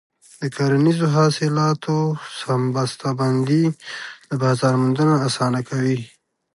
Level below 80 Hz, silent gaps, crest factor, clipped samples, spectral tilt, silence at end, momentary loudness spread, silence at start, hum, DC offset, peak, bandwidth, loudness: -64 dBFS; none; 14 dB; under 0.1%; -6.5 dB/octave; 0.45 s; 11 LU; 0.4 s; none; under 0.1%; -4 dBFS; 11.5 kHz; -20 LUFS